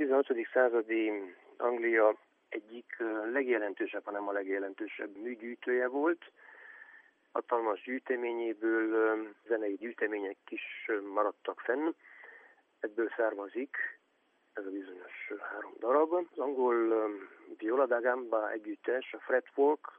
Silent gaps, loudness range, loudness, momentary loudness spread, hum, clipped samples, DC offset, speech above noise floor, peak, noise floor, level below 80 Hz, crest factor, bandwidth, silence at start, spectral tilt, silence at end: none; 5 LU; -33 LUFS; 15 LU; none; under 0.1%; under 0.1%; 40 dB; -14 dBFS; -73 dBFS; under -90 dBFS; 20 dB; 3.6 kHz; 0 s; -6.5 dB/octave; 0.1 s